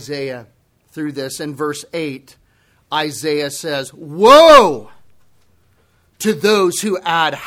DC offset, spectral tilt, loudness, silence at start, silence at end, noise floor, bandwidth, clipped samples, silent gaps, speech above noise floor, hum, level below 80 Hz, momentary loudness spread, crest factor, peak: under 0.1%; -3.5 dB/octave; -14 LUFS; 0 s; 0 s; -57 dBFS; 16.5 kHz; 0.3%; none; 43 dB; none; -48 dBFS; 20 LU; 16 dB; 0 dBFS